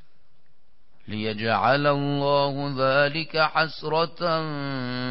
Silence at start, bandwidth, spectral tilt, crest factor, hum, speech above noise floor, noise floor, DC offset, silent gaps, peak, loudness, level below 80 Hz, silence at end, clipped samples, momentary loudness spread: 1.1 s; 5.8 kHz; -10 dB/octave; 16 dB; none; 43 dB; -66 dBFS; 1%; none; -8 dBFS; -24 LUFS; -60 dBFS; 0 s; under 0.1%; 9 LU